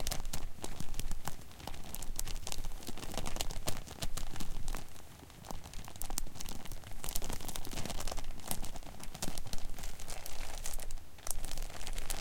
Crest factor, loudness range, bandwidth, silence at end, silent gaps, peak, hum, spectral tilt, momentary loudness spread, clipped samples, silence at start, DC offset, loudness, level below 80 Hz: 22 dB; 2 LU; 17 kHz; 0 s; none; -12 dBFS; none; -3 dB/octave; 8 LU; under 0.1%; 0 s; under 0.1%; -43 LUFS; -40 dBFS